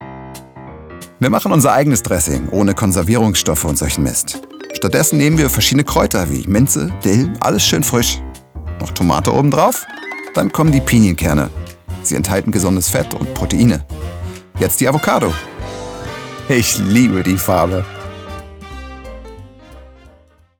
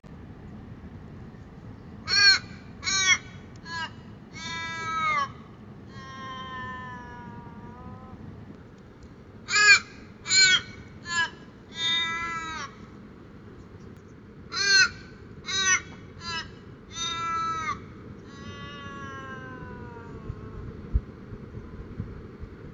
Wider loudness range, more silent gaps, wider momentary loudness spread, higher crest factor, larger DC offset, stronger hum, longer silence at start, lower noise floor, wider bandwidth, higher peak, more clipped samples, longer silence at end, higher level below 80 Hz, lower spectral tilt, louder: second, 3 LU vs 16 LU; neither; second, 19 LU vs 27 LU; second, 14 dB vs 26 dB; neither; neither; about the same, 0 s vs 0.05 s; about the same, -49 dBFS vs -47 dBFS; first, over 20 kHz vs 9.4 kHz; first, 0 dBFS vs -4 dBFS; neither; first, 0.7 s vs 0 s; first, -32 dBFS vs -48 dBFS; first, -4.5 dB/octave vs -1 dB/octave; first, -14 LUFS vs -24 LUFS